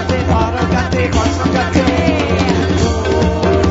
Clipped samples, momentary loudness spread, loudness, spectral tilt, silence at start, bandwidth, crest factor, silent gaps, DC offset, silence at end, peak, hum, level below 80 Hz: under 0.1%; 1 LU; -14 LUFS; -6 dB/octave; 0 s; 8 kHz; 14 dB; none; under 0.1%; 0 s; 0 dBFS; none; -24 dBFS